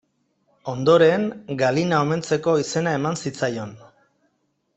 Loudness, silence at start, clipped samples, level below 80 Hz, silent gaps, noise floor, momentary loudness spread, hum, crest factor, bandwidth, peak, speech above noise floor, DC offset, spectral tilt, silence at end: -21 LUFS; 0.65 s; under 0.1%; -62 dBFS; none; -70 dBFS; 15 LU; none; 20 dB; 8.4 kHz; -4 dBFS; 50 dB; under 0.1%; -5.5 dB/octave; 1 s